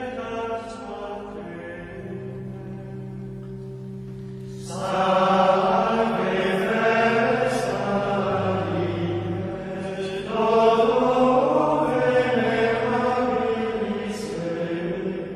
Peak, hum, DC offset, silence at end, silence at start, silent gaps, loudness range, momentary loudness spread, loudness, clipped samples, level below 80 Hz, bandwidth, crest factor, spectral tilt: -6 dBFS; none; under 0.1%; 0 s; 0 s; none; 14 LU; 17 LU; -22 LUFS; under 0.1%; -52 dBFS; 13 kHz; 18 dB; -6 dB/octave